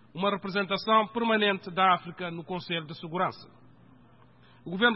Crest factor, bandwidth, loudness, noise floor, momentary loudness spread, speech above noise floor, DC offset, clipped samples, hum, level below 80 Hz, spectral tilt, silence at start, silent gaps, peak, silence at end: 20 dB; 5.8 kHz; -28 LUFS; -57 dBFS; 13 LU; 30 dB; under 0.1%; under 0.1%; none; -70 dBFS; -8.5 dB/octave; 0.15 s; none; -10 dBFS; 0 s